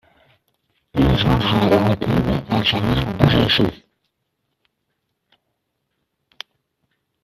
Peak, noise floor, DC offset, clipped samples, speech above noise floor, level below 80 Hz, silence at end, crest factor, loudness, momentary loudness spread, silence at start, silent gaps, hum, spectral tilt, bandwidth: 0 dBFS; -74 dBFS; under 0.1%; under 0.1%; 57 dB; -36 dBFS; 3.5 s; 20 dB; -18 LUFS; 18 LU; 0.95 s; none; none; -7 dB/octave; 14 kHz